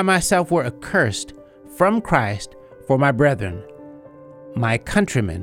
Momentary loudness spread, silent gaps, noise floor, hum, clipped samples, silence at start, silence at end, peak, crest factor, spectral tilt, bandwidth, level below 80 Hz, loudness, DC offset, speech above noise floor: 18 LU; none; -42 dBFS; none; under 0.1%; 0 s; 0 s; -2 dBFS; 18 dB; -5.5 dB/octave; 16.5 kHz; -44 dBFS; -20 LUFS; under 0.1%; 23 dB